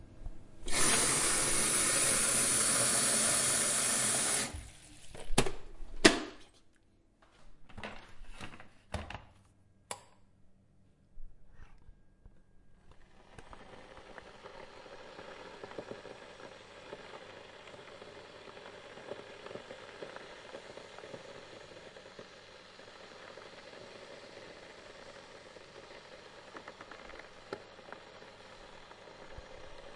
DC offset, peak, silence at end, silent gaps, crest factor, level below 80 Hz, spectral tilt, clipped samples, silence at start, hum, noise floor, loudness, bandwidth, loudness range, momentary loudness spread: under 0.1%; -8 dBFS; 0 s; none; 28 dB; -52 dBFS; -1.5 dB/octave; under 0.1%; 0 s; none; -66 dBFS; -28 LUFS; 11.5 kHz; 24 LU; 26 LU